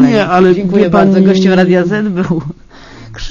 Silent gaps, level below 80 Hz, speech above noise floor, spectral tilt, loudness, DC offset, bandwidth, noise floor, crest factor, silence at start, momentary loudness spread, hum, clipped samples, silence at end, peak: none; -34 dBFS; 24 dB; -7.5 dB/octave; -10 LUFS; under 0.1%; 7.4 kHz; -33 dBFS; 10 dB; 0 s; 9 LU; none; 0.6%; 0 s; 0 dBFS